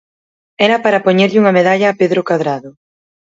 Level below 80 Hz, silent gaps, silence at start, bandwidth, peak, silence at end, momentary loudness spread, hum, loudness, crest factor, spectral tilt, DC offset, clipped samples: -62 dBFS; none; 0.6 s; 7.8 kHz; 0 dBFS; 0.55 s; 6 LU; none; -12 LUFS; 14 dB; -6 dB/octave; under 0.1%; under 0.1%